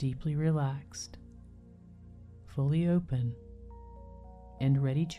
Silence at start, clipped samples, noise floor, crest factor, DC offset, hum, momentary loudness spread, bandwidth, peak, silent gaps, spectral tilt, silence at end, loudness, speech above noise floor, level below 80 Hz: 0 s; under 0.1%; -53 dBFS; 16 dB; under 0.1%; none; 24 LU; 10.5 kHz; -18 dBFS; none; -7.5 dB/octave; 0 s; -32 LUFS; 23 dB; -52 dBFS